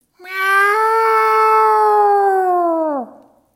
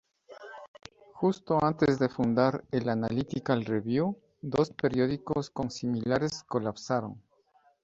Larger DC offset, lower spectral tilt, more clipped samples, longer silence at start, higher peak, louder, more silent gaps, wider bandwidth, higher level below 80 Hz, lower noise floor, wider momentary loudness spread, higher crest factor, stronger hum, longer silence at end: neither; second, -2 dB/octave vs -7 dB/octave; neither; about the same, 0.25 s vs 0.3 s; first, -4 dBFS vs -10 dBFS; first, -14 LUFS vs -29 LUFS; second, none vs 0.68-0.74 s; first, 16.5 kHz vs 7.8 kHz; second, -78 dBFS vs -60 dBFS; second, -44 dBFS vs -66 dBFS; second, 8 LU vs 15 LU; second, 12 dB vs 20 dB; neither; second, 0.45 s vs 0.65 s